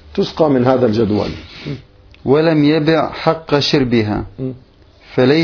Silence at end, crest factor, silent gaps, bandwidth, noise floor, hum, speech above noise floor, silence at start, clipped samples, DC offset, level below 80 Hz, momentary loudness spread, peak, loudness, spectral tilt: 0 s; 16 dB; none; 5.4 kHz; -42 dBFS; none; 28 dB; 0.1 s; under 0.1%; under 0.1%; -42 dBFS; 15 LU; 0 dBFS; -15 LUFS; -7 dB/octave